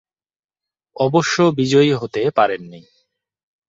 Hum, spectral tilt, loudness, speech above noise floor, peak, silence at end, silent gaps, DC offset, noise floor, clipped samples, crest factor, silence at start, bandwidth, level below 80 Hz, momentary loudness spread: none; -5.5 dB/octave; -17 LUFS; over 73 dB; -2 dBFS; 0.9 s; none; under 0.1%; under -90 dBFS; under 0.1%; 18 dB; 1 s; 7.8 kHz; -60 dBFS; 6 LU